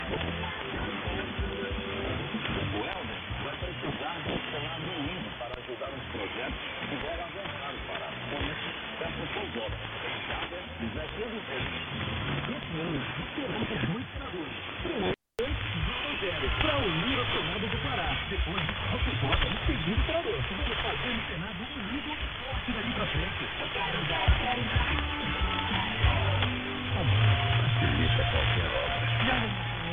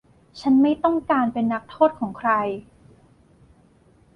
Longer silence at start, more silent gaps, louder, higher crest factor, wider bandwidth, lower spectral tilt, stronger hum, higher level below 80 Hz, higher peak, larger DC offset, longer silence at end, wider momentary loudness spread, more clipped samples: second, 0 s vs 0.35 s; neither; second, -31 LUFS vs -21 LUFS; about the same, 22 dB vs 18 dB; second, 4.5 kHz vs 6.6 kHz; about the same, -7.5 dB/octave vs -7.5 dB/octave; neither; first, -40 dBFS vs -58 dBFS; about the same, -8 dBFS vs -6 dBFS; neither; second, 0 s vs 1.55 s; about the same, 9 LU vs 9 LU; neither